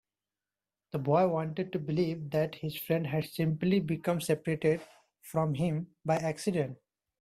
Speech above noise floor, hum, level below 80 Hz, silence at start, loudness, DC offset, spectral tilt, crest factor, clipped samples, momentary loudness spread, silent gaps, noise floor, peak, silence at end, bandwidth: over 59 dB; none; -68 dBFS; 0.95 s; -32 LUFS; under 0.1%; -7 dB/octave; 18 dB; under 0.1%; 7 LU; none; under -90 dBFS; -14 dBFS; 0.45 s; 16 kHz